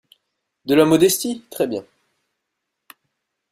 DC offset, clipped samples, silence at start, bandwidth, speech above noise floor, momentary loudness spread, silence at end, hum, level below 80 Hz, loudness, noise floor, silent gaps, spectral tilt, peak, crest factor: under 0.1%; under 0.1%; 0.65 s; 16 kHz; 61 dB; 15 LU; 1.7 s; none; -60 dBFS; -18 LUFS; -79 dBFS; none; -4.5 dB/octave; -2 dBFS; 20 dB